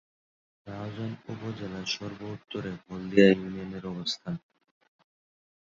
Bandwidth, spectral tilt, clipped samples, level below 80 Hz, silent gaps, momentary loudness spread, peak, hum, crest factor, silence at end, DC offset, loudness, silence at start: 7.6 kHz; -5 dB/octave; under 0.1%; -62 dBFS; none; 18 LU; -6 dBFS; none; 26 dB; 1.4 s; under 0.1%; -30 LUFS; 0.65 s